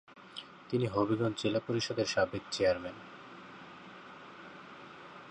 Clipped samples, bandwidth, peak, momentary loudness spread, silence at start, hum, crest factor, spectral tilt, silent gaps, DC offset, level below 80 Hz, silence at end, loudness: under 0.1%; 10.5 kHz; -16 dBFS; 19 LU; 0.1 s; none; 20 dB; -5 dB/octave; none; under 0.1%; -64 dBFS; 0 s; -33 LUFS